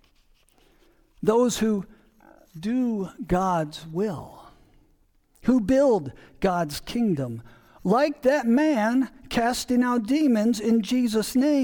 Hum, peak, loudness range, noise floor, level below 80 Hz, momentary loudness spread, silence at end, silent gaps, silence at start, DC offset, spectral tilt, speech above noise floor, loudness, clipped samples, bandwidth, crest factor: none; -8 dBFS; 6 LU; -62 dBFS; -50 dBFS; 9 LU; 0 s; none; 1.2 s; under 0.1%; -5.5 dB/octave; 39 dB; -24 LUFS; under 0.1%; 19 kHz; 16 dB